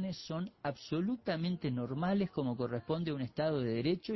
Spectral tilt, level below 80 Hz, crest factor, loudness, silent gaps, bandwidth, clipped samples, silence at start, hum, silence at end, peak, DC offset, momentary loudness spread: -7.5 dB/octave; -66 dBFS; 14 dB; -36 LUFS; none; 6 kHz; under 0.1%; 0 s; none; 0 s; -22 dBFS; under 0.1%; 6 LU